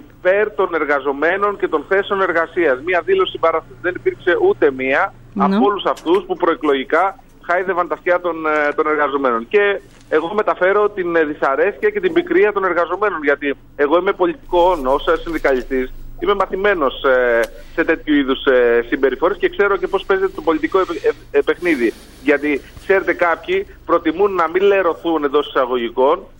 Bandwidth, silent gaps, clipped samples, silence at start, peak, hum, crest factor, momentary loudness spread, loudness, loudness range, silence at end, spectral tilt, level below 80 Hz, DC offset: 16.5 kHz; none; under 0.1%; 0.25 s; -2 dBFS; none; 14 dB; 5 LU; -17 LUFS; 1 LU; 0.1 s; -6 dB/octave; -40 dBFS; under 0.1%